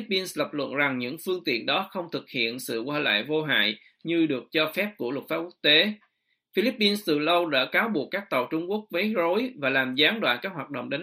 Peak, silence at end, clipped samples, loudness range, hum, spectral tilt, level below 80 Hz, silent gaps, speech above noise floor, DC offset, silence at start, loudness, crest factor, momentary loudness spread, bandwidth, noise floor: -6 dBFS; 0 s; under 0.1%; 2 LU; none; -4 dB/octave; -74 dBFS; none; 39 dB; under 0.1%; 0 s; -25 LUFS; 20 dB; 10 LU; 15.5 kHz; -66 dBFS